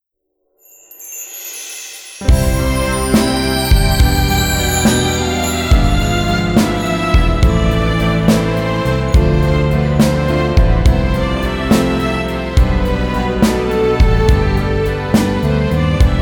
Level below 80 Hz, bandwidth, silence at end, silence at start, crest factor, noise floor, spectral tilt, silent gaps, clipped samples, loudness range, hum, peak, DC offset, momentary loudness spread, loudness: -18 dBFS; 19.5 kHz; 0 s; 1 s; 12 dB; -69 dBFS; -5.5 dB/octave; none; under 0.1%; 2 LU; none; 0 dBFS; under 0.1%; 5 LU; -14 LUFS